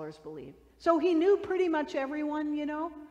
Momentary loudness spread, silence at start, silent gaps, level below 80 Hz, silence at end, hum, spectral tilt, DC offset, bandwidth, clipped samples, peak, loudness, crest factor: 18 LU; 0 s; none; -64 dBFS; 0.05 s; none; -5.5 dB/octave; under 0.1%; 8.6 kHz; under 0.1%; -12 dBFS; -29 LUFS; 18 dB